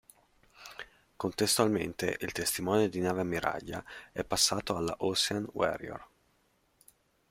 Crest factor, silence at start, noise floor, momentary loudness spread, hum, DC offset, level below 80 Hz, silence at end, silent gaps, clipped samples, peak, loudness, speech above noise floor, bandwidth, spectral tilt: 22 dB; 0.6 s; -72 dBFS; 19 LU; none; under 0.1%; -62 dBFS; 1.25 s; none; under 0.1%; -10 dBFS; -31 LUFS; 40 dB; 16 kHz; -3 dB/octave